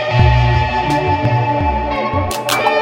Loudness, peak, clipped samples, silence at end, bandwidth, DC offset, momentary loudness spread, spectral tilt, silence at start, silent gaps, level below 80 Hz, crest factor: -15 LUFS; 0 dBFS; under 0.1%; 0 s; 16.5 kHz; under 0.1%; 6 LU; -5.5 dB/octave; 0 s; none; -24 dBFS; 14 dB